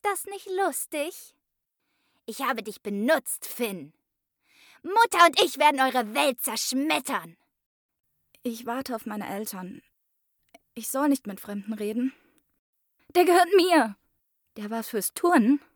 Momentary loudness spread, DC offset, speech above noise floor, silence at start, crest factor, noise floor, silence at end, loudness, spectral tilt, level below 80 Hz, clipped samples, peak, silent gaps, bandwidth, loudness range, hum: 17 LU; under 0.1%; 56 dB; 0.05 s; 22 dB; -81 dBFS; 0.15 s; -25 LUFS; -3 dB/octave; -76 dBFS; under 0.1%; -6 dBFS; 7.66-7.89 s, 12.59-12.73 s; over 20 kHz; 9 LU; none